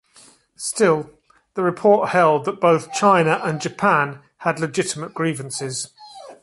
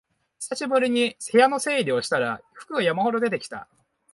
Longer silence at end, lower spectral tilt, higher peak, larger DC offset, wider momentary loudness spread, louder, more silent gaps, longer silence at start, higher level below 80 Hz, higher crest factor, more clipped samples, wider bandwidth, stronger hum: second, 0.1 s vs 0.5 s; about the same, -4.5 dB/octave vs -3.5 dB/octave; first, -2 dBFS vs -6 dBFS; neither; second, 12 LU vs 15 LU; first, -20 LUFS vs -23 LUFS; neither; first, 0.6 s vs 0.4 s; first, -64 dBFS vs -70 dBFS; about the same, 18 dB vs 18 dB; neither; about the same, 11.5 kHz vs 11.5 kHz; neither